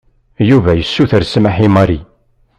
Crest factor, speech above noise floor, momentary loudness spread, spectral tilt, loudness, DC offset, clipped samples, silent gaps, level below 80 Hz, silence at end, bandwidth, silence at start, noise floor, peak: 12 dB; 43 dB; 5 LU; -7.5 dB/octave; -12 LUFS; under 0.1%; under 0.1%; none; -34 dBFS; 0.55 s; 10 kHz; 0.4 s; -53 dBFS; 0 dBFS